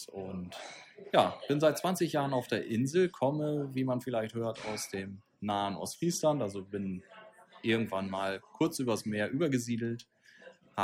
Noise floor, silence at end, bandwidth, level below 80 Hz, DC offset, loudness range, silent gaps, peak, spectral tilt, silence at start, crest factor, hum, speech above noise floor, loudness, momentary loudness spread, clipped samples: -57 dBFS; 0 s; 16.5 kHz; -74 dBFS; under 0.1%; 4 LU; none; -12 dBFS; -5.5 dB/octave; 0 s; 22 dB; none; 24 dB; -33 LUFS; 13 LU; under 0.1%